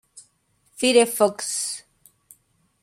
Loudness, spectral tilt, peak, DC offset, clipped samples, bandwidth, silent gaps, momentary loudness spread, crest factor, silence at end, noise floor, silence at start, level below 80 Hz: -21 LUFS; -2 dB/octave; -4 dBFS; under 0.1%; under 0.1%; 16 kHz; none; 11 LU; 20 dB; 1 s; -65 dBFS; 0.15 s; -72 dBFS